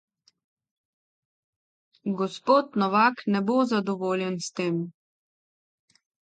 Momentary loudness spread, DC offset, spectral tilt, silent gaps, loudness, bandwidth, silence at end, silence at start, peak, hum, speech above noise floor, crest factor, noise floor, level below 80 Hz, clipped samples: 10 LU; under 0.1%; -5.5 dB/octave; none; -25 LUFS; 9.2 kHz; 1.3 s; 2.05 s; -8 dBFS; none; over 65 dB; 20 dB; under -90 dBFS; -78 dBFS; under 0.1%